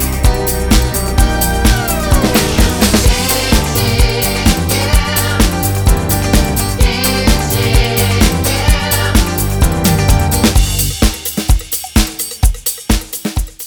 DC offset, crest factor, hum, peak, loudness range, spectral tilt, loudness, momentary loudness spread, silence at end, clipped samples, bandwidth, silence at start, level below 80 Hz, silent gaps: under 0.1%; 12 dB; none; 0 dBFS; 1 LU; -4 dB/octave; -13 LUFS; 4 LU; 0 s; under 0.1%; over 20 kHz; 0 s; -16 dBFS; none